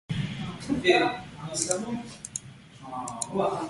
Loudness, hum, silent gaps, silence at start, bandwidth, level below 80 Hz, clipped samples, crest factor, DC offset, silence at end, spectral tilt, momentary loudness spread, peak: -29 LUFS; none; none; 0.1 s; 11.5 kHz; -56 dBFS; under 0.1%; 22 dB; under 0.1%; 0 s; -4 dB/octave; 15 LU; -6 dBFS